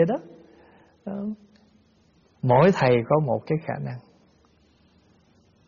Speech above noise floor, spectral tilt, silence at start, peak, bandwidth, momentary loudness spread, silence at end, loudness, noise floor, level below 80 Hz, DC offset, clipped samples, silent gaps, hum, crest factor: 38 dB; -6.5 dB/octave; 0 s; -6 dBFS; 7 kHz; 20 LU; 1.65 s; -23 LUFS; -61 dBFS; -60 dBFS; under 0.1%; under 0.1%; none; none; 20 dB